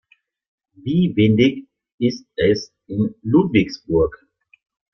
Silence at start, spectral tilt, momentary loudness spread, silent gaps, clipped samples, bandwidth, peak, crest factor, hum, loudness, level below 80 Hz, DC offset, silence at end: 0.85 s; -7.5 dB/octave; 8 LU; 1.94-1.98 s; under 0.1%; 6.6 kHz; -2 dBFS; 18 dB; none; -19 LUFS; -46 dBFS; under 0.1%; 0.8 s